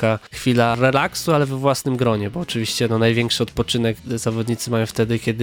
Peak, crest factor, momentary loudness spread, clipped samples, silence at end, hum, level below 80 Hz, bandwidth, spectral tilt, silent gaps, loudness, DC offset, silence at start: -2 dBFS; 18 dB; 6 LU; under 0.1%; 0 s; none; -46 dBFS; 17.5 kHz; -5 dB/octave; none; -20 LUFS; under 0.1%; 0 s